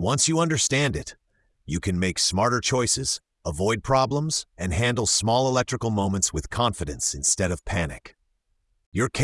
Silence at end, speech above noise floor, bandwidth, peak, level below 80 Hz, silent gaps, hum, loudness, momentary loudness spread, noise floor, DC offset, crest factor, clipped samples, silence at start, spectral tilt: 0 s; 47 dB; 12 kHz; -8 dBFS; -44 dBFS; 8.86-8.92 s; none; -24 LUFS; 9 LU; -71 dBFS; under 0.1%; 16 dB; under 0.1%; 0 s; -3.5 dB/octave